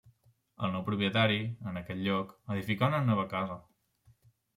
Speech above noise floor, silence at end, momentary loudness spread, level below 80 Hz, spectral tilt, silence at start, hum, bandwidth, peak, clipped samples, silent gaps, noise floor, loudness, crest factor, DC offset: 35 dB; 0.95 s; 11 LU; -68 dBFS; -7.5 dB/octave; 0.6 s; none; 15.5 kHz; -14 dBFS; under 0.1%; none; -66 dBFS; -32 LUFS; 18 dB; under 0.1%